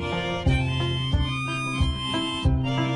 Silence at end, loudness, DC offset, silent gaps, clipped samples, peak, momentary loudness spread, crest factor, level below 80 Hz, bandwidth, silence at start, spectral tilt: 0 s; -25 LUFS; under 0.1%; none; under 0.1%; -10 dBFS; 3 LU; 14 dB; -32 dBFS; 11 kHz; 0 s; -6 dB/octave